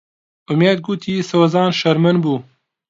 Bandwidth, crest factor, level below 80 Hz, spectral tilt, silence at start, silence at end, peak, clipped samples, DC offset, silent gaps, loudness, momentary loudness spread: 7.6 kHz; 16 dB; -60 dBFS; -6.5 dB/octave; 0.5 s; 0.5 s; -2 dBFS; under 0.1%; under 0.1%; none; -16 LUFS; 7 LU